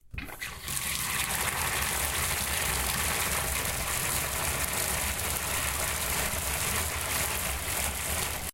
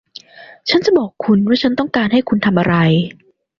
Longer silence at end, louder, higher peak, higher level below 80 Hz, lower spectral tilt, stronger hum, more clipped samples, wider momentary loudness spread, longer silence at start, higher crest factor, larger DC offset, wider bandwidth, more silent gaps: second, 0 s vs 0.45 s; second, -28 LUFS vs -15 LUFS; second, -10 dBFS vs 0 dBFS; first, -42 dBFS vs -50 dBFS; second, -1.5 dB/octave vs -7 dB/octave; neither; neither; about the same, 3 LU vs 4 LU; second, 0.05 s vs 0.4 s; first, 22 dB vs 16 dB; neither; first, 17 kHz vs 7 kHz; neither